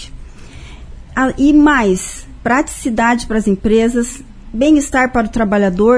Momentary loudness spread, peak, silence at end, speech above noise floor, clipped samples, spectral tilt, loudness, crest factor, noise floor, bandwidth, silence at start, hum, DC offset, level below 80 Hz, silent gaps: 13 LU; 0 dBFS; 0 s; 20 dB; under 0.1%; -5 dB/octave; -14 LUFS; 14 dB; -33 dBFS; 11 kHz; 0 s; none; under 0.1%; -32 dBFS; none